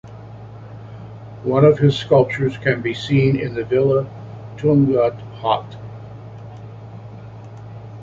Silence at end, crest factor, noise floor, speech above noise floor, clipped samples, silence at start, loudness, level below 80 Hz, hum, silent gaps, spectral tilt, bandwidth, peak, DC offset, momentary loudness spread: 0 s; 18 dB; -36 dBFS; 20 dB; under 0.1%; 0.05 s; -18 LUFS; -50 dBFS; none; none; -8 dB/octave; 7.6 kHz; -2 dBFS; under 0.1%; 22 LU